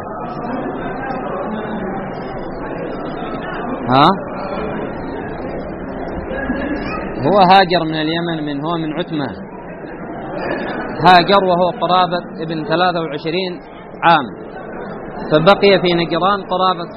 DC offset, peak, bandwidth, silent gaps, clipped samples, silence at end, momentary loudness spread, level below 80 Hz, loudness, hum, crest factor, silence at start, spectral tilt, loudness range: under 0.1%; 0 dBFS; 6 kHz; none; under 0.1%; 0 s; 16 LU; -40 dBFS; -17 LUFS; none; 16 dB; 0 s; -3.5 dB/octave; 7 LU